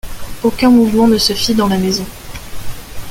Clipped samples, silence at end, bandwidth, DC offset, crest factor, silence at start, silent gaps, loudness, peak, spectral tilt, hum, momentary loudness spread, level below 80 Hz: under 0.1%; 0 s; 17 kHz; under 0.1%; 14 dB; 0.05 s; none; -13 LUFS; 0 dBFS; -4.5 dB/octave; none; 21 LU; -32 dBFS